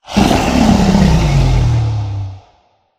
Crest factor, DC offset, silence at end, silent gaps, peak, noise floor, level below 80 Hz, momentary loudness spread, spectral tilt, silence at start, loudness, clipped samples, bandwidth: 12 dB; under 0.1%; 0.6 s; none; 0 dBFS; -54 dBFS; -20 dBFS; 12 LU; -6.5 dB/octave; 0.1 s; -12 LUFS; under 0.1%; 15.5 kHz